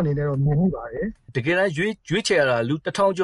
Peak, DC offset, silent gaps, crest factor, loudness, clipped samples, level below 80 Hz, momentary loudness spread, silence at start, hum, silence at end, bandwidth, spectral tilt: -8 dBFS; under 0.1%; none; 14 dB; -22 LUFS; under 0.1%; -46 dBFS; 9 LU; 0 s; none; 0 s; 11.5 kHz; -6 dB/octave